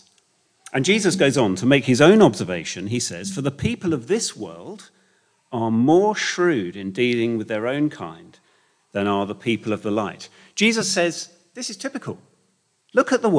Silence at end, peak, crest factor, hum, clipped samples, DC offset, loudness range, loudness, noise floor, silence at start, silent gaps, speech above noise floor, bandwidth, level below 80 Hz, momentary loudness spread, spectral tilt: 0 s; 0 dBFS; 20 dB; none; under 0.1%; under 0.1%; 7 LU; -21 LUFS; -66 dBFS; 0.75 s; none; 46 dB; 10.5 kHz; -58 dBFS; 16 LU; -4.5 dB/octave